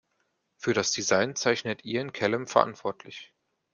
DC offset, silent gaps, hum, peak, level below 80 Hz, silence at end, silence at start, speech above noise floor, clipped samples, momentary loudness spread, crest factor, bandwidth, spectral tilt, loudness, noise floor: under 0.1%; none; none; -4 dBFS; -70 dBFS; 0.5 s; 0.6 s; 48 dB; under 0.1%; 12 LU; 24 dB; 10 kHz; -3 dB/octave; -27 LUFS; -75 dBFS